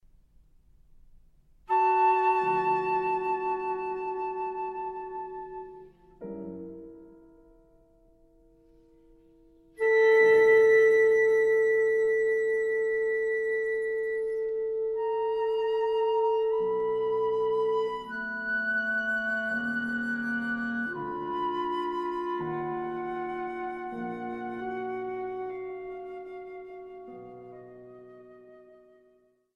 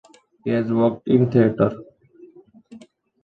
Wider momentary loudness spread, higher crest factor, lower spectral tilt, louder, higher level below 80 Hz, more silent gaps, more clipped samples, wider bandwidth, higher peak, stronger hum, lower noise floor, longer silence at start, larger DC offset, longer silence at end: first, 20 LU vs 11 LU; about the same, 16 dB vs 18 dB; second, -6 dB/octave vs -10 dB/octave; second, -27 LUFS vs -20 LUFS; second, -64 dBFS vs -58 dBFS; neither; neither; first, 6.2 kHz vs 5 kHz; second, -12 dBFS vs -4 dBFS; neither; first, -65 dBFS vs -48 dBFS; first, 1.7 s vs 0.45 s; neither; first, 0.95 s vs 0.45 s